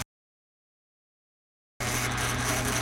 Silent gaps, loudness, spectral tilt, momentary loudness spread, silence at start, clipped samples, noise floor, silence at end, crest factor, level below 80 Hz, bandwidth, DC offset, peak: 0.05-1.80 s; -28 LUFS; -3 dB/octave; 8 LU; 0 s; under 0.1%; under -90 dBFS; 0 s; 18 dB; -46 dBFS; 16.5 kHz; under 0.1%; -16 dBFS